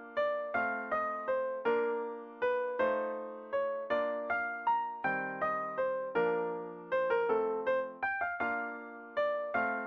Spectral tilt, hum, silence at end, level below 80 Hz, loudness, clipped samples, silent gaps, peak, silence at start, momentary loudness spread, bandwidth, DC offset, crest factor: -6.5 dB/octave; none; 0 s; -74 dBFS; -34 LUFS; under 0.1%; none; -18 dBFS; 0 s; 6 LU; 6 kHz; under 0.1%; 16 dB